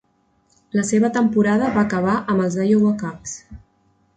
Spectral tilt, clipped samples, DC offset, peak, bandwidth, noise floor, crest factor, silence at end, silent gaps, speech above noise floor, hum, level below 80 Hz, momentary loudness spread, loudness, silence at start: -6.5 dB/octave; under 0.1%; under 0.1%; -6 dBFS; 9.2 kHz; -63 dBFS; 14 dB; 0.6 s; none; 44 dB; none; -52 dBFS; 12 LU; -19 LUFS; 0.75 s